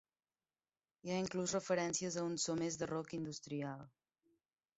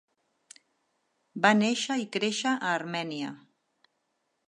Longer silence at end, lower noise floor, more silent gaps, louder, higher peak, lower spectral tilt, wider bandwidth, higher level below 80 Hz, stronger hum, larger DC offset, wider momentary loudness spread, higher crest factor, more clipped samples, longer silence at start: second, 0.9 s vs 1.15 s; first, under -90 dBFS vs -78 dBFS; neither; second, -40 LUFS vs -28 LUFS; second, -22 dBFS vs -8 dBFS; first, -5 dB/octave vs -3.5 dB/octave; second, 8 kHz vs 11 kHz; first, -76 dBFS vs -82 dBFS; neither; neither; second, 8 LU vs 14 LU; about the same, 20 dB vs 24 dB; neither; second, 1.05 s vs 1.35 s